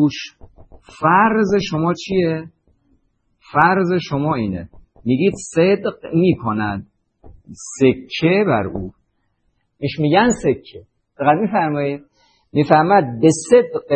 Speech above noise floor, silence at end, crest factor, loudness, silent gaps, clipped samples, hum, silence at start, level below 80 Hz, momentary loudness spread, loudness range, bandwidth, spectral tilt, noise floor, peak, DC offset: 50 dB; 0 s; 18 dB; -17 LUFS; none; under 0.1%; none; 0 s; -50 dBFS; 14 LU; 3 LU; 8.8 kHz; -6 dB/octave; -66 dBFS; 0 dBFS; under 0.1%